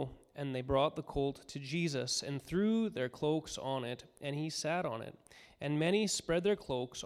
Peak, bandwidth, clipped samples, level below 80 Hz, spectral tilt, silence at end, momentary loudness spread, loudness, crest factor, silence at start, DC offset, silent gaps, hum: -18 dBFS; 15 kHz; under 0.1%; -60 dBFS; -4.5 dB/octave; 0 s; 11 LU; -36 LUFS; 18 dB; 0 s; under 0.1%; none; none